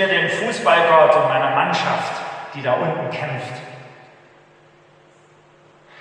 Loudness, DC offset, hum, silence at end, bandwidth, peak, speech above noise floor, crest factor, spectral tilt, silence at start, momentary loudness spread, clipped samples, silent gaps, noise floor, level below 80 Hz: -18 LUFS; under 0.1%; none; 2.1 s; 10 kHz; -2 dBFS; 33 dB; 20 dB; -4.5 dB/octave; 0 s; 18 LU; under 0.1%; none; -51 dBFS; -74 dBFS